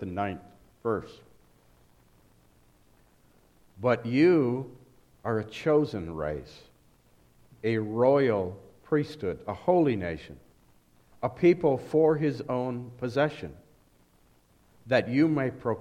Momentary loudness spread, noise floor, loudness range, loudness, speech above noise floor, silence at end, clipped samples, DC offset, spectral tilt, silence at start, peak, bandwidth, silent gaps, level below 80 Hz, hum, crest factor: 14 LU; -63 dBFS; 6 LU; -27 LUFS; 36 dB; 0 s; under 0.1%; under 0.1%; -8 dB/octave; 0 s; -10 dBFS; 10.5 kHz; none; -58 dBFS; none; 20 dB